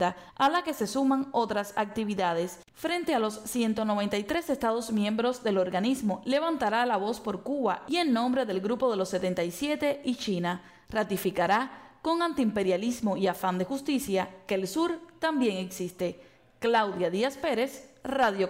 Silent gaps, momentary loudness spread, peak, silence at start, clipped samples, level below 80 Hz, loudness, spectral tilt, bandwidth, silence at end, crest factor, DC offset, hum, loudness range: none; 6 LU; -16 dBFS; 0 s; under 0.1%; -62 dBFS; -29 LUFS; -5 dB/octave; 16 kHz; 0 s; 14 dB; under 0.1%; none; 2 LU